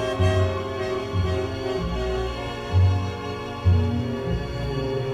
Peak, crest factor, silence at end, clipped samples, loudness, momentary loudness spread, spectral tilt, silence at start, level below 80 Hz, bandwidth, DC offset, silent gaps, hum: -8 dBFS; 14 dB; 0 s; under 0.1%; -25 LUFS; 7 LU; -7 dB/octave; 0 s; -34 dBFS; 9.4 kHz; under 0.1%; none; none